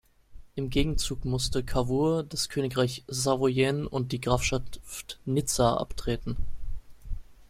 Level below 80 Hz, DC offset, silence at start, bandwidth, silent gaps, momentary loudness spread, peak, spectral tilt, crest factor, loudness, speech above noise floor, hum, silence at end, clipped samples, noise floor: -38 dBFS; under 0.1%; 0.3 s; 16 kHz; none; 16 LU; -10 dBFS; -5 dB/octave; 18 dB; -28 LUFS; 20 dB; none; 0.05 s; under 0.1%; -48 dBFS